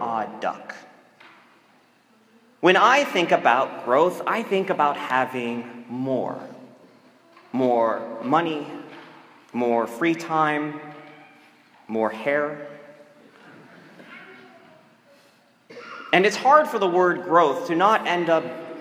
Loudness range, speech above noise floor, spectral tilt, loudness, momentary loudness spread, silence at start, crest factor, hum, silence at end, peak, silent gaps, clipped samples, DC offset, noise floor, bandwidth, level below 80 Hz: 10 LU; 37 dB; -5 dB/octave; -22 LUFS; 22 LU; 0 s; 22 dB; none; 0 s; -2 dBFS; none; under 0.1%; under 0.1%; -59 dBFS; 16 kHz; -82 dBFS